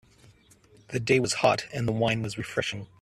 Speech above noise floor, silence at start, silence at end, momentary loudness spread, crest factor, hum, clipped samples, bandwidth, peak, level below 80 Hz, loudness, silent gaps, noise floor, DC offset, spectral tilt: 31 dB; 0.9 s; 0.15 s; 9 LU; 20 dB; none; under 0.1%; 13.5 kHz; -8 dBFS; -58 dBFS; -27 LUFS; none; -58 dBFS; under 0.1%; -4.5 dB/octave